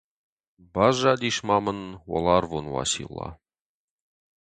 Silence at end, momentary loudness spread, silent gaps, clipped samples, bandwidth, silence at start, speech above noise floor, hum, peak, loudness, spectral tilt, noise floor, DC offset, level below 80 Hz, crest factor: 1.05 s; 15 LU; none; under 0.1%; 9.4 kHz; 0.75 s; over 66 dB; none; -6 dBFS; -24 LUFS; -4 dB/octave; under -90 dBFS; under 0.1%; -50 dBFS; 22 dB